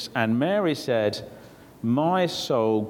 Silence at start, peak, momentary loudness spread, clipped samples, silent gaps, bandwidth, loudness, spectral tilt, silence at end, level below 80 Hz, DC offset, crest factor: 0 s; -8 dBFS; 9 LU; under 0.1%; none; 17.5 kHz; -24 LUFS; -6 dB/octave; 0 s; -64 dBFS; under 0.1%; 18 dB